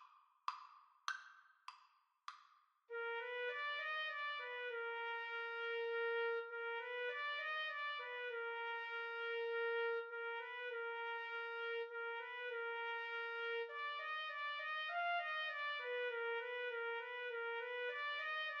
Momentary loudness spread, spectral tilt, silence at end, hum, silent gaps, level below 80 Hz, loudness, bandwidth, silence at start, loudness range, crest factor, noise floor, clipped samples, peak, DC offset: 8 LU; 7.5 dB/octave; 0 s; none; none; under -90 dBFS; -43 LUFS; 7.2 kHz; 0 s; 3 LU; 22 dB; -74 dBFS; under 0.1%; -24 dBFS; under 0.1%